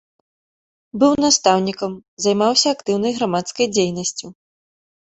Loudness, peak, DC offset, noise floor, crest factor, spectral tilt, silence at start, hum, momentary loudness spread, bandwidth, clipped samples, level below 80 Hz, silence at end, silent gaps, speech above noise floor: -18 LUFS; 0 dBFS; under 0.1%; under -90 dBFS; 20 dB; -3.5 dB/octave; 0.95 s; none; 12 LU; 8.4 kHz; under 0.1%; -58 dBFS; 0.75 s; 2.08-2.17 s; over 72 dB